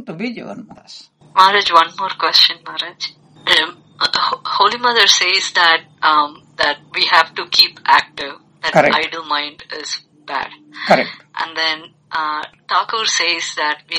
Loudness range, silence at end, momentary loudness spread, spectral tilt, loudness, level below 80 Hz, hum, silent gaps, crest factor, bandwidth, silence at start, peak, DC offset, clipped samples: 6 LU; 0 s; 15 LU; -1 dB/octave; -15 LUFS; -60 dBFS; none; none; 16 dB; over 20 kHz; 0 s; 0 dBFS; under 0.1%; 0.1%